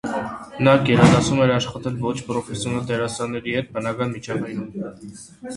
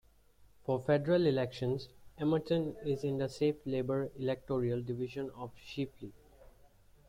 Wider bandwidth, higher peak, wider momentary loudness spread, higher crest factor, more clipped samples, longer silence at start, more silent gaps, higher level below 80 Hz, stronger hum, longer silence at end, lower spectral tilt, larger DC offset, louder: second, 11.5 kHz vs 16 kHz; first, 0 dBFS vs -18 dBFS; first, 17 LU vs 14 LU; about the same, 20 dB vs 18 dB; neither; second, 0.05 s vs 0.4 s; neither; first, -46 dBFS vs -62 dBFS; neither; second, 0 s vs 0.95 s; second, -6 dB/octave vs -7.5 dB/octave; neither; first, -21 LUFS vs -35 LUFS